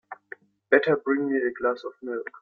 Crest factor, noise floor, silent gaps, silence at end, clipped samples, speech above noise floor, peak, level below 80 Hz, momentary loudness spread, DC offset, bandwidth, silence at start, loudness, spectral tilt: 22 dB; -48 dBFS; none; 0.05 s; under 0.1%; 23 dB; -4 dBFS; -70 dBFS; 21 LU; under 0.1%; 5.4 kHz; 0.1 s; -25 LUFS; -8 dB/octave